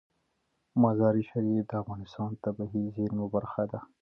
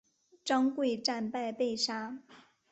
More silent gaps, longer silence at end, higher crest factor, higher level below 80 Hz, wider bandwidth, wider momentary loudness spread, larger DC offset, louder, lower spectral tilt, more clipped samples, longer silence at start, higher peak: neither; second, 0.15 s vs 0.3 s; about the same, 20 dB vs 18 dB; first, -62 dBFS vs -78 dBFS; second, 5.8 kHz vs 8.4 kHz; second, 10 LU vs 13 LU; neither; about the same, -31 LUFS vs -32 LUFS; first, -11 dB/octave vs -3 dB/octave; neither; first, 0.75 s vs 0.45 s; first, -12 dBFS vs -16 dBFS